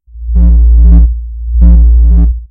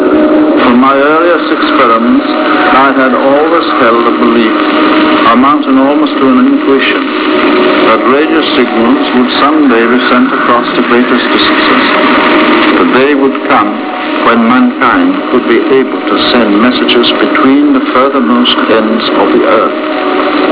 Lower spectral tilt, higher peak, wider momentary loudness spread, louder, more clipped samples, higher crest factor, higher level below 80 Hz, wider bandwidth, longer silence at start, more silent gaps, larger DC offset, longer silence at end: first, -14 dB/octave vs -8 dB/octave; about the same, 0 dBFS vs 0 dBFS; first, 10 LU vs 3 LU; about the same, -8 LUFS vs -7 LUFS; about the same, 2% vs 3%; about the same, 6 dB vs 6 dB; first, -6 dBFS vs -44 dBFS; second, 1.2 kHz vs 4 kHz; first, 0.15 s vs 0 s; neither; second, under 0.1% vs 0.3%; about the same, 0.05 s vs 0 s